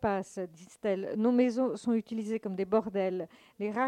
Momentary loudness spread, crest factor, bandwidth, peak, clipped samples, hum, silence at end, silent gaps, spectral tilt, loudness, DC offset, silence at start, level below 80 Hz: 13 LU; 16 dB; 10.5 kHz; -14 dBFS; under 0.1%; none; 0 s; none; -7 dB/octave; -32 LUFS; under 0.1%; 0 s; -66 dBFS